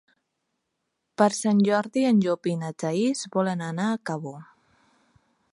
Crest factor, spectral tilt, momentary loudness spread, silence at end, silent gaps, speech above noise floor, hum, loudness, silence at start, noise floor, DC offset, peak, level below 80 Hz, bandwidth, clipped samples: 20 dB; -6 dB/octave; 12 LU; 1.1 s; none; 55 dB; none; -25 LUFS; 1.2 s; -79 dBFS; under 0.1%; -6 dBFS; -74 dBFS; 11.5 kHz; under 0.1%